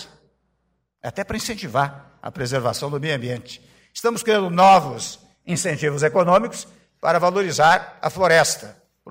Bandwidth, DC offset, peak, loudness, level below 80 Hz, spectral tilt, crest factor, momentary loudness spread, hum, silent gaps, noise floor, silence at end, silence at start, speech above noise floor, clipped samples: 16 kHz; under 0.1%; -6 dBFS; -20 LUFS; -54 dBFS; -4 dB/octave; 16 dB; 17 LU; none; none; -71 dBFS; 0 s; 0 s; 51 dB; under 0.1%